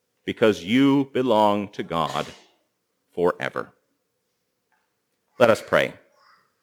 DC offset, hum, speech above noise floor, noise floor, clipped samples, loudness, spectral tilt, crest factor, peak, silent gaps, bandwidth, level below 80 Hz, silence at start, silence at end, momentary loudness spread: under 0.1%; none; 53 dB; -75 dBFS; under 0.1%; -22 LUFS; -5.5 dB/octave; 24 dB; 0 dBFS; none; 19.5 kHz; -62 dBFS; 0.25 s; 0.7 s; 15 LU